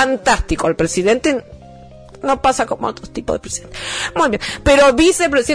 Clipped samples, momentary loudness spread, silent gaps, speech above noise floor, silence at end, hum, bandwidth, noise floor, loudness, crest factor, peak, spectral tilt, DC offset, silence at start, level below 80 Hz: under 0.1%; 13 LU; none; 23 dB; 0 s; none; 11 kHz; -39 dBFS; -16 LUFS; 14 dB; -2 dBFS; -3.5 dB/octave; under 0.1%; 0 s; -34 dBFS